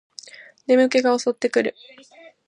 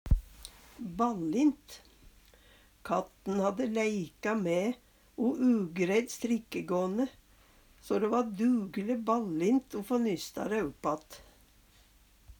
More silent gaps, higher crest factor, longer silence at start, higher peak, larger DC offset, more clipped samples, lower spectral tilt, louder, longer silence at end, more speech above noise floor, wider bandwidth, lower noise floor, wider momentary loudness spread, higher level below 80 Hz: neither; about the same, 18 dB vs 18 dB; first, 0.7 s vs 0.05 s; first, -4 dBFS vs -14 dBFS; neither; neither; second, -3.5 dB/octave vs -6 dB/octave; first, -20 LUFS vs -32 LUFS; first, 0.75 s vs 0.05 s; second, 23 dB vs 31 dB; second, 10 kHz vs over 20 kHz; second, -43 dBFS vs -62 dBFS; first, 21 LU vs 16 LU; second, -78 dBFS vs -44 dBFS